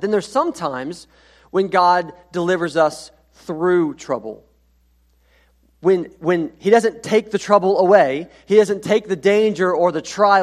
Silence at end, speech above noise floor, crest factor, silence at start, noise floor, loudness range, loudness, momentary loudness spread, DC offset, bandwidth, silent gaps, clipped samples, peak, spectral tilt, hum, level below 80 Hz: 0 s; 41 dB; 18 dB; 0 s; -58 dBFS; 7 LU; -18 LUFS; 12 LU; under 0.1%; 12.5 kHz; none; under 0.1%; 0 dBFS; -5.5 dB/octave; 60 Hz at -50 dBFS; -58 dBFS